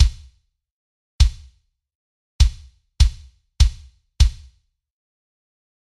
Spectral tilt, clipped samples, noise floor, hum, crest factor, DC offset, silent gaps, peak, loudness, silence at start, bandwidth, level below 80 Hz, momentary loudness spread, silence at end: -3.5 dB/octave; under 0.1%; -58 dBFS; none; 20 dB; under 0.1%; 0.71-1.19 s, 1.95-2.39 s; -2 dBFS; -21 LUFS; 0 s; 11.5 kHz; -22 dBFS; 0 LU; 1.65 s